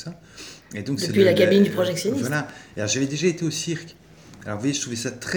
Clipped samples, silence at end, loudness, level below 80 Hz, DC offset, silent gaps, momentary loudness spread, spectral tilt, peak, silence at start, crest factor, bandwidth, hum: under 0.1%; 0 s; -22 LUFS; -62 dBFS; under 0.1%; none; 20 LU; -4.5 dB/octave; -4 dBFS; 0 s; 20 dB; over 20 kHz; none